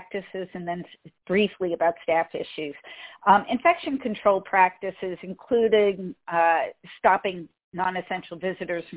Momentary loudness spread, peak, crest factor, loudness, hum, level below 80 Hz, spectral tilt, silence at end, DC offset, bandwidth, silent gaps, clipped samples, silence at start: 14 LU; -4 dBFS; 20 dB; -25 LUFS; none; -64 dBFS; -9 dB/octave; 0 s; under 0.1%; 4 kHz; 7.64-7.72 s; under 0.1%; 0 s